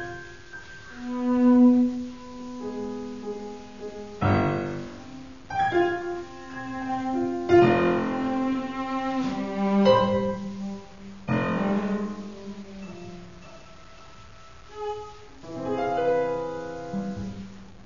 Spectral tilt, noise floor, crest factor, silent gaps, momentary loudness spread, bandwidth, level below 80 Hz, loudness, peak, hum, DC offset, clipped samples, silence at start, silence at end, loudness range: -7.5 dB/octave; -48 dBFS; 20 dB; none; 22 LU; 7.4 kHz; -52 dBFS; -25 LUFS; -6 dBFS; none; 0.4%; under 0.1%; 0 s; 0 s; 9 LU